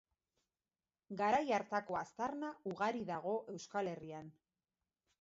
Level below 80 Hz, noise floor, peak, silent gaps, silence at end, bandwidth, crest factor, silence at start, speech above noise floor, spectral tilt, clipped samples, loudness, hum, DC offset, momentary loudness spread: -78 dBFS; under -90 dBFS; -22 dBFS; none; 0.9 s; 7.6 kHz; 20 dB; 1.1 s; over 50 dB; -4 dB/octave; under 0.1%; -40 LUFS; none; under 0.1%; 15 LU